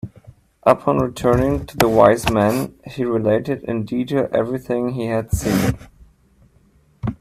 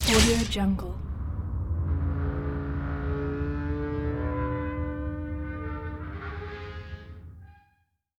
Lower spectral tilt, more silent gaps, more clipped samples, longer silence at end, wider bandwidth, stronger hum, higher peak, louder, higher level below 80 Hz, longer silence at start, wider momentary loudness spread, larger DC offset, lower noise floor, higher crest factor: first, -6.5 dB/octave vs -5 dB/octave; neither; neither; second, 0.05 s vs 0.65 s; about the same, 16 kHz vs 16.5 kHz; neither; first, 0 dBFS vs -8 dBFS; first, -19 LUFS vs -30 LUFS; about the same, -38 dBFS vs -34 dBFS; about the same, 0.05 s vs 0 s; about the same, 11 LU vs 13 LU; neither; second, -55 dBFS vs -71 dBFS; about the same, 20 dB vs 22 dB